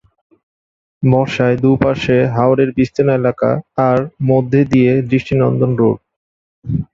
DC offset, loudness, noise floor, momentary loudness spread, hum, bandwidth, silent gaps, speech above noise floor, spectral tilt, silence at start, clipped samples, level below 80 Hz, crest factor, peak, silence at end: under 0.1%; -14 LUFS; under -90 dBFS; 4 LU; none; 7.4 kHz; 6.16-6.62 s; over 77 dB; -8.5 dB/octave; 1 s; under 0.1%; -42 dBFS; 14 dB; 0 dBFS; 0.1 s